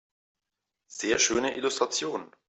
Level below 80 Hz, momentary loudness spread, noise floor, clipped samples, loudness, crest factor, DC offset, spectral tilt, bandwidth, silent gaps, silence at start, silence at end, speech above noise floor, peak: -64 dBFS; 11 LU; -86 dBFS; under 0.1%; -27 LUFS; 20 dB; under 0.1%; -1.5 dB/octave; 8.4 kHz; none; 0.9 s; 0.25 s; 58 dB; -10 dBFS